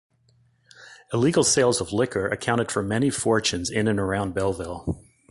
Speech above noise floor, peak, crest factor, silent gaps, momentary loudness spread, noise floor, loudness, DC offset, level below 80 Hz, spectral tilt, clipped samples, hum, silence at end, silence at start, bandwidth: 39 dB; -6 dBFS; 18 dB; none; 12 LU; -62 dBFS; -23 LUFS; under 0.1%; -48 dBFS; -4 dB/octave; under 0.1%; none; 0.3 s; 0.8 s; 11.5 kHz